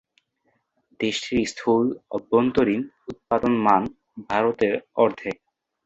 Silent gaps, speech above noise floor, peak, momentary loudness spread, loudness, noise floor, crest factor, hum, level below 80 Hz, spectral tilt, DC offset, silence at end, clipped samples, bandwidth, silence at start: none; 48 dB; -4 dBFS; 14 LU; -23 LUFS; -71 dBFS; 20 dB; none; -54 dBFS; -5.5 dB/octave; under 0.1%; 0.5 s; under 0.1%; 8.2 kHz; 1 s